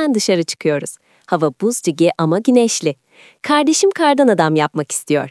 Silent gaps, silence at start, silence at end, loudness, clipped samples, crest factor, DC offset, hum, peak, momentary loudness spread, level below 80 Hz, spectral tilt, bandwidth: none; 0 s; 0 s; -16 LUFS; under 0.1%; 16 dB; under 0.1%; none; 0 dBFS; 9 LU; -76 dBFS; -4.5 dB/octave; 12 kHz